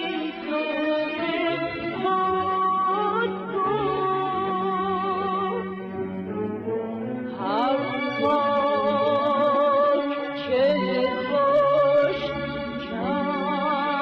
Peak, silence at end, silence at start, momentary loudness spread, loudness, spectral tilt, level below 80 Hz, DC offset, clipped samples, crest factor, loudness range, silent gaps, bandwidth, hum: -10 dBFS; 0 s; 0 s; 10 LU; -24 LUFS; -7.5 dB/octave; -58 dBFS; under 0.1%; under 0.1%; 14 dB; 5 LU; none; 6 kHz; none